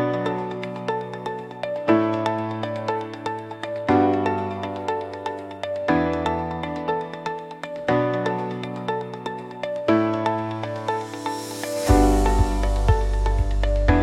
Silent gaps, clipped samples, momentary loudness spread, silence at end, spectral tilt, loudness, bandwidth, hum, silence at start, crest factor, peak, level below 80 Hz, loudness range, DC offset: none; under 0.1%; 11 LU; 0 s; -6.5 dB/octave; -24 LUFS; 14.5 kHz; none; 0 s; 20 dB; -4 dBFS; -28 dBFS; 4 LU; under 0.1%